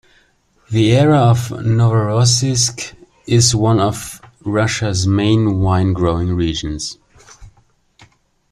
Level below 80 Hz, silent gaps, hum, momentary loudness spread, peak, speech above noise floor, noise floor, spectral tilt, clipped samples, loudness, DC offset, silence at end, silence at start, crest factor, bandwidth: -40 dBFS; none; none; 13 LU; 0 dBFS; 42 dB; -56 dBFS; -5 dB/octave; under 0.1%; -15 LUFS; under 0.1%; 1.05 s; 0.7 s; 16 dB; 13.5 kHz